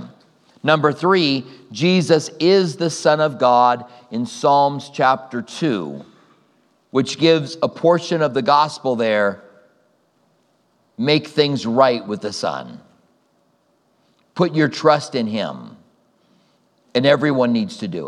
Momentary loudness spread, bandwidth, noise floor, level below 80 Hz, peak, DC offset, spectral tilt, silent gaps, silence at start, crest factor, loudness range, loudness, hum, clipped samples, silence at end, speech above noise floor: 10 LU; 11.5 kHz; -62 dBFS; -74 dBFS; 0 dBFS; under 0.1%; -5.5 dB/octave; none; 0 s; 18 dB; 5 LU; -18 LUFS; none; under 0.1%; 0 s; 44 dB